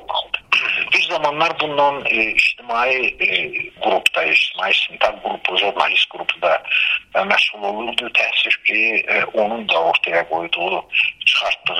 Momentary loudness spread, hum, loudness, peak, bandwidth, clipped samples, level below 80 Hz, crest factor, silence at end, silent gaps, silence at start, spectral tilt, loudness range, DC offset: 5 LU; none; -17 LUFS; 0 dBFS; 15.5 kHz; under 0.1%; -56 dBFS; 18 dB; 0 s; none; 0 s; -2 dB/octave; 1 LU; under 0.1%